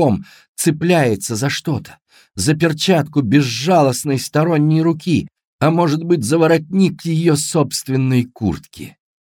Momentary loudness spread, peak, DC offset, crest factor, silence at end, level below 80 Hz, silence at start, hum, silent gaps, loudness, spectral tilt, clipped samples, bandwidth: 10 LU; -2 dBFS; under 0.1%; 16 dB; 0.3 s; -50 dBFS; 0 s; none; 0.48-0.55 s, 5.47-5.59 s; -16 LUFS; -5.5 dB/octave; under 0.1%; 18 kHz